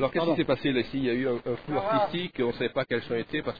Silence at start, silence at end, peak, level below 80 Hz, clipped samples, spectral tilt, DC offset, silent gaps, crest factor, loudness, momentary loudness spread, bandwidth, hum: 0 s; 0 s; -12 dBFS; -56 dBFS; under 0.1%; -8.5 dB/octave; 0.3%; none; 16 dB; -28 LUFS; 4 LU; 5 kHz; none